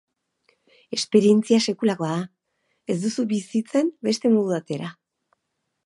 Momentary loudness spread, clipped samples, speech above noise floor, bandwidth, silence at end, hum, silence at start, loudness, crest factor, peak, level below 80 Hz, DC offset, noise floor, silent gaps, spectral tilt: 14 LU; under 0.1%; 56 dB; 11.5 kHz; 0.95 s; none; 0.9 s; -22 LUFS; 18 dB; -4 dBFS; -74 dBFS; under 0.1%; -78 dBFS; none; -5.5 dB/octave